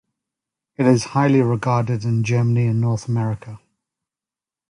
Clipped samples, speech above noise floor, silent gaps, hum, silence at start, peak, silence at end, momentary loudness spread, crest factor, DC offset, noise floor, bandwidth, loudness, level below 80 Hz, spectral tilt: under 0.1%; 72 dB; none; none; 0.8 s; -4 dBFS; 1.1 s; 7 LU; 16 dB; under 0.1%; -90 dBFS; 11 kHz; -19 LUFS; -54 dBFS; -7.5 dB/octave